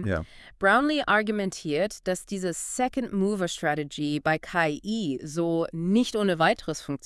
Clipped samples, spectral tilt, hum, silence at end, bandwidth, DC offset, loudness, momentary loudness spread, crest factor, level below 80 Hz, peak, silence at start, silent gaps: under 0.1%; -4.5 dB/octave; none; 0.1 s; 12 kHz; under 0.1%; -26 LUFS; 8 LU; 18 dB; -54 dBFS; -8 dBFS; 0 s; none